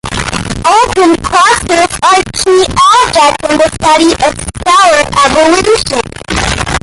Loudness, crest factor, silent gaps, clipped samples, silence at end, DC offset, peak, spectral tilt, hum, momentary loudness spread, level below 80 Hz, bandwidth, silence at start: -8 LUFS; 8 dB; none; under 0.1%; 0.05 s; under 0.1%; 0 dBFS; -3 dB/octave; none; 8 LU; -28 dBFS; 12 kHz; 0.05 s